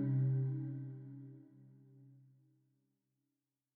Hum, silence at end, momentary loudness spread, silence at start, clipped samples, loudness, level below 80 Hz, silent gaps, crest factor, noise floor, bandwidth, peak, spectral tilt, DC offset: none; 1.6 s; 23 LU; 0 s; under 0.1%; -39 LUFS; under -90 dBFS; none; 14 dB; under -90 dBFS; 2.1 kHz; -28 dBFS; -13 dB/octave; under 0.1%